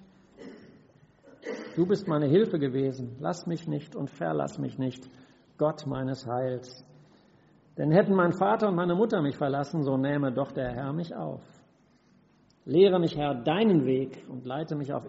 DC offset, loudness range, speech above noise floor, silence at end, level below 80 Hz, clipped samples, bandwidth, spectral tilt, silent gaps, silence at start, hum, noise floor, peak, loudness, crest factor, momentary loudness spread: under 0.1%; 7 LU; 36 dB; 0 s; -64 dBFS; under 0.1%; 7.6 kHz; -6.5 dB/octave; none; 0.4 s; none; -63 dBFS; -8 dBFS; -28 LUFS; 20 dB; 15 LU